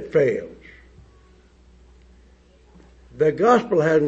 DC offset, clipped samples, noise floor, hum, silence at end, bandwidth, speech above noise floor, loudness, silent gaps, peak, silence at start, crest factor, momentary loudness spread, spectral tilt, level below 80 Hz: under 0.1%; under 0.1%; -53 dBFS; none; 0 s; 7.8 kHz; 34 dB; -19 LUFS; none; -4 dBFS; 0 s; 20 dB; 12 LU; -7 dB/octave; -52 dBFS